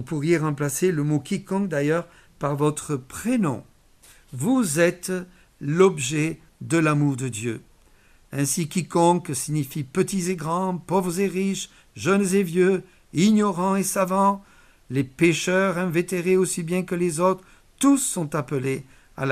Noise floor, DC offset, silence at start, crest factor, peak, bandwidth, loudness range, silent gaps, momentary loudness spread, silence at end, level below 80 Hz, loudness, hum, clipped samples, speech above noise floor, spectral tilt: -55 dBFS; under 0.1%; 0 s; 18 dB; -4 dBFS; 15.5 kHz; 3 LU; none; 10 LU; 0 s; -56 dBFS; -23 LUFS; none; under 0.1%; 32 dB; -5.5 dB/octave